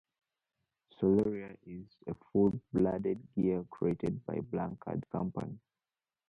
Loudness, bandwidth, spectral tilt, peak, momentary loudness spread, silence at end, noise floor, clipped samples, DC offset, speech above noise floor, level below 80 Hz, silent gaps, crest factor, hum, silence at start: -34 LUFS; 5.8 kHz; -10.5 dB/octave; -16 dBFS; 16 LU; 0.7 s; under -90 dBFS; under 0.1%; under 0.1%; over 56 dB; -62 dBFS; none; 18 dB; none; 1 s